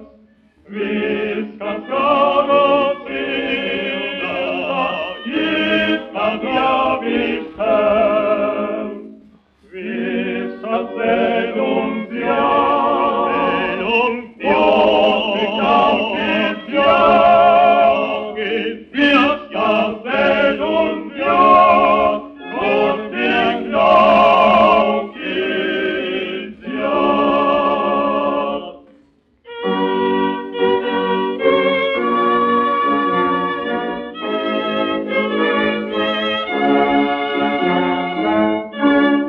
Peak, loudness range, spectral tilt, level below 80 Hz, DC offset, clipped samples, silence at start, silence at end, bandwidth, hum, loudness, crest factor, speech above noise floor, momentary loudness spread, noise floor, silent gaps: 0 dBFS; 6 LU; -7 dB/octave; -50 dBFS; under 0.1%; under 0.1%; 0 s; 0 s; 6.6 kHz; none; -16 LUFS; 16 dB; 36 dB; 11 LU; -54 dBFS; none